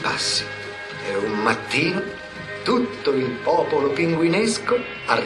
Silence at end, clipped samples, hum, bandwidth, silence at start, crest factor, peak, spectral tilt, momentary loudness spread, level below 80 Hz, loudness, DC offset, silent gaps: 0 s; under 0.1%; none; 12 kHz; 0 s; 18 dB; -4 dBFS; -4 dB/octave; 11 LU; -56 dBFS; -22 LUFS; under 0.1%; none